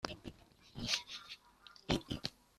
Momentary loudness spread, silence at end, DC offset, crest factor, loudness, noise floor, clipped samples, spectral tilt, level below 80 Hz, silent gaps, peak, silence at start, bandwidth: 17 LU; 0.25 s; under 0.1%; 28 dB; -40 LUFS; -62 dBFS; under 0.1%; -3.5 dB/octave; -58 dBFS; none; -16 dBFS; 0.05 s; 14 kHz